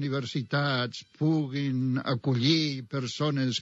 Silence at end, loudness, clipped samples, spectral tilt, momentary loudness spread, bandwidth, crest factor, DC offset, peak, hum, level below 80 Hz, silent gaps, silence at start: 0 s; -28 LUFS; under 0.1%; -6 dB/octave; 7 LU; 8 kHz; 18 dB; under 0.1%; -10 dBFS; none; -74 dBFS; none; 0 s